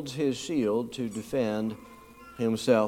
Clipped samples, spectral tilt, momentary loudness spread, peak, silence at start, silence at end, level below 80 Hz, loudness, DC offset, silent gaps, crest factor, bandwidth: under 0.1%; -5.5 dB/octave; 19 LU; -10 dBFS; 0 s; 0 s; -62 dBFS; -30 LUFS; under 0.1%; none; 20 dB; 16.5 kHz